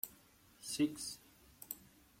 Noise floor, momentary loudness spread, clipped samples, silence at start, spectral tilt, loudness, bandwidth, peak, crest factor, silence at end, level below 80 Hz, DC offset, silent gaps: -66 dBFS; 16 LU; under 0.1%; 0.05 s; -3.5 dB/octave; -42 LUFS; 16.5 kHz; -22 dBFS; 22 dB; 0.35 s; -72 dBFS; under 0.1%; none